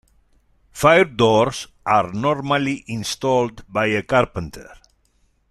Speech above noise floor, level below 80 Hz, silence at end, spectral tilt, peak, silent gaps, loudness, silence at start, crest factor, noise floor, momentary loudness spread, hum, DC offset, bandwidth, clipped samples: 43 dB; -48 dBFS; 0.8 s; -5 dB/octave; -2 dBFS; none; -19 LUFS; 0.75 s; 18 dB; -62 dBFS; 12 LU; none; under 0.1%; 14.5 kHz; under 0.1%